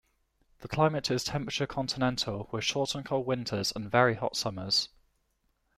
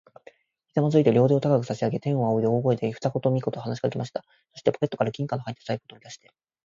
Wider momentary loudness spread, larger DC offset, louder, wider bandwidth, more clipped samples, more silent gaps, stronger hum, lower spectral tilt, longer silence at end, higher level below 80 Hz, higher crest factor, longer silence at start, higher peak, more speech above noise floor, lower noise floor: second, 7 LU vs 13 LU; neither; second, -30 LUFS vs -25 LUFS; first, 15.5 kHz vs 7.6 kHz; neither; neither; neither; second, -4 dB/octave vs -8 dB/octave; first, 0.9 s vs 0.5 s; first, -58 dBFS vs -64 dBFS; about the same, 22 dB vs 20 dB; second, 0.6 s vs 0.75 s; about the same, -8 dBFS vs -6 dBFS; first, 45 dB vs 30 dB; first, -75 dBFS vs -54 dBFS